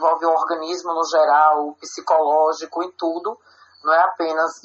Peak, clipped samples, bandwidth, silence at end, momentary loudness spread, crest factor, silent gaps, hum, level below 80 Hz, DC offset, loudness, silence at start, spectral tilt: -4 dBFS; under 0.1%; 8 kHz; 0.05 s; 12 LU; 16 dB; none; none; -78 dBFS; under 0.1%; -19 LUFS; 0 s; 0.5 dB/octave